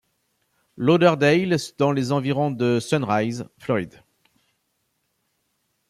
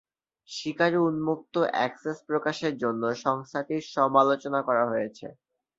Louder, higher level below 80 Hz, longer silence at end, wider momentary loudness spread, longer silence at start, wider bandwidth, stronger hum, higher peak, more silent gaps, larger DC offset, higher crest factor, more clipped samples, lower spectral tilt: first, -21 LUFS vs -27 LUFS; first, -64 dBFS vs -72 dBFS; first, 2 s vs 0.45 s; second, 9 LU vs 12 LU; first, 0.8 s vs 0.5 s; first, 14 kHz vs 7.8 kHz; neither; about the same, -4 dBFS vs -6 dBFS; neither; neither; about the same, 20 dB vs 20 dB; neither; about the same, -6.5 dB/octave vs -5.5 dB/octave